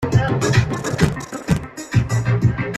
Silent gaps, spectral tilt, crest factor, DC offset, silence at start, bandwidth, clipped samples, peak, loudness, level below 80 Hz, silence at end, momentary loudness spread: none; -6 dB/octave; 18 dB; under 0.1%; 0 s; 13 kHz; under 0.1%; 0 dBFS; -20 LUFS; -36 dBFS; 0 s; 5 LU